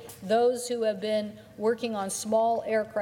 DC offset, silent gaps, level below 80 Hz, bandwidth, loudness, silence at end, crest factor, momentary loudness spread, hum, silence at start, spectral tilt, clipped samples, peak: under 0.1%; none; -70 dBFS; 17.5 kHz; -28 LUFS; 0 s; 14 dB; 6 LU; none; 0 s; -4 dB/octave; under 0.1%; -14 dBFS